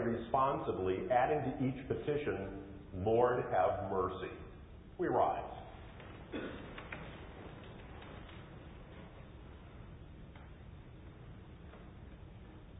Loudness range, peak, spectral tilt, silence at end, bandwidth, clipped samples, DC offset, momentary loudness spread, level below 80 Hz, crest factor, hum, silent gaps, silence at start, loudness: 19 LU; -18 dBFS; -3.5 dB/octave; 0 s; 3.9 kHz; under 0.1%; under 0.1%; 22 LU; -56 dBFS; 22 dB; none; none; 0 s; -36 LUFS